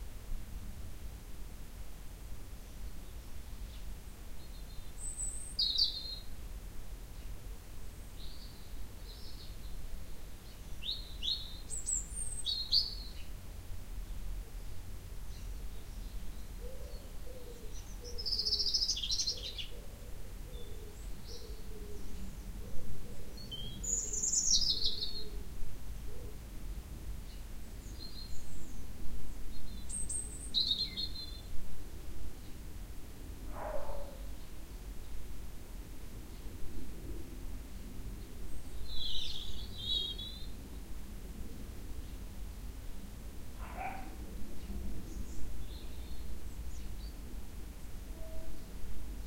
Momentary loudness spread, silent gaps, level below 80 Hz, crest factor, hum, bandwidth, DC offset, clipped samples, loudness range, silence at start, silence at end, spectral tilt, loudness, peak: 18 LU; none; -46 dBFS; 20 dB; none; 16 kHz; under 0.1%; under 0.1%; 15 LU; 0 s; 0 s; -2 dB/octave; -40 LUFS; -16 dBFS